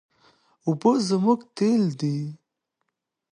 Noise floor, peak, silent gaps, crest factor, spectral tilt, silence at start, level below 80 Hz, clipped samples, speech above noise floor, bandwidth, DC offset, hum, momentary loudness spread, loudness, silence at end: -79 dBFS; -6 dBFS; none; 18 dB; -7 dB/octave; 0.65 s; -74 dBFS; under 0.1%; 57 dB; 10.5 kHz; under 0.1%; none; 10 LU; -24 LUFS; 1 s